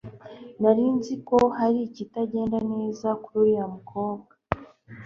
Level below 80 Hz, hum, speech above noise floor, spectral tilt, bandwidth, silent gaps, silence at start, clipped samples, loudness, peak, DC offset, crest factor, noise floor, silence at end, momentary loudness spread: -56 dBFS; none; 21 dB; -7.5 dB/octave; 7.4 kHz; none; 0.05 s; under 0.1%; -25 LUFS; -2 dBFS; under 0.1%; 22 dB; -45 dBFS; 0 s; 12 LU